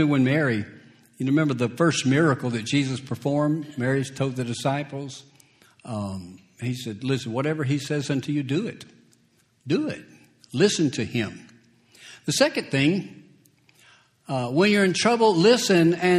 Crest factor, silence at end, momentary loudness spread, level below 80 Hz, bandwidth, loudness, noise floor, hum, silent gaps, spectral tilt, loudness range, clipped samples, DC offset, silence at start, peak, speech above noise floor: 20 dB; 0 s; 15 LU; -64 dBFS; 14 kHz; -23 LUFS; -63 dBFS; none; none; -5.5 dB/octave; 7 LU; under 0.1%; under 0.1%; 0 s; -4 dBFS; 40 dB